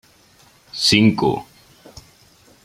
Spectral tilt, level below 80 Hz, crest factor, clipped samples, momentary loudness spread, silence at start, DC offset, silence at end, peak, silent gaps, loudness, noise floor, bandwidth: -4.5 dB/octave; -52 dBFS; 20 dB; under 0.1%; 16 LU; 0.75 s; under 0.1%; 1.2 s; -2 dBFS; none; -17 LUFS; -52 dBFS; 15 kHz